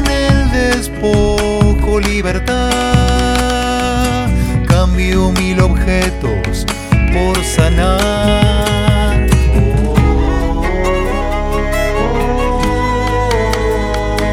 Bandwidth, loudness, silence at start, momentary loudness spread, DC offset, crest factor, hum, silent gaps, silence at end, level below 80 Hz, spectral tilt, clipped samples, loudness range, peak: 15.5 kHz; -14 LUFS; 0 s; 4 LU; under 0.1%; 12 dB; none; none; 0 s; -16 dBFS; -5.5 dB/octave; under 0.1%; 3 LU; 0 dBFS